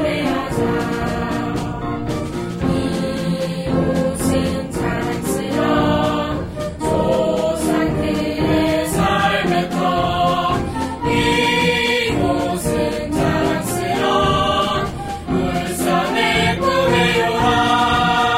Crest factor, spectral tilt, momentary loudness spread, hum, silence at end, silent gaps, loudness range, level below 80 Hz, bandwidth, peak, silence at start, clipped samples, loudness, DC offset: 14 dB; -5 dB/octave; 7 LU; none; 0 s; none; 4 LU; -34 dBFS; 16 kHz; -4 dBFS; 0 s; under 0.1%; -18 LUFS; under 0.1%